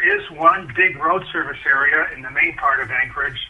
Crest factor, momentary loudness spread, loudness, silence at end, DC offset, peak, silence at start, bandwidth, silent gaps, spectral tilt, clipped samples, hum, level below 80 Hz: 18 dB; 6 LU; -18 LUFS; 0 s; under 0.1%; 0 dBFS; 0 s; 10.5 kHz; none; -5.5 dB/octave; under 0.1%; none; -48 dBFS